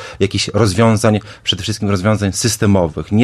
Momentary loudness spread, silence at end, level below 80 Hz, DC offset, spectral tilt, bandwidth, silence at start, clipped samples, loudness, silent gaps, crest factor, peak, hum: 6 LU; 0 s; -40 dBFS; under 0.1%; -5 dB/octave; 13 kHz; 0 s; under 0.1%; -15 LUFS; none; 14 dB; 0 dBFS; none